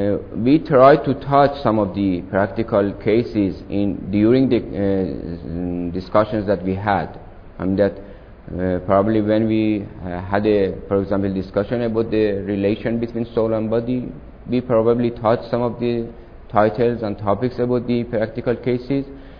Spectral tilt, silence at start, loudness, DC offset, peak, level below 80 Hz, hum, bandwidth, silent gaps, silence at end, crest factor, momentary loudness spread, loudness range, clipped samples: -10 dB/octave; 0 s; -19 LUFS; under 0.1%; 0 dBFS; -40 dBFS; none; 5.4 kHz; none; 0 s; 18 dB; 9 LU; 4 LU; under 0.1%